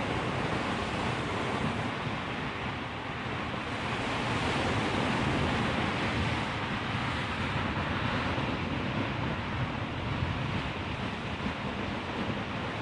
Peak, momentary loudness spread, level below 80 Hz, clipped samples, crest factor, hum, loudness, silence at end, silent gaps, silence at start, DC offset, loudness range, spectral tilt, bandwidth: -16 dBFS; 5 LU; -48 dBFS; under 0.1%; 16 dB; none; -32 LUFS; 0 s; none; 0 s; under 0.1%; 3 LU; -5.5 dB/octave; 11.5 kHz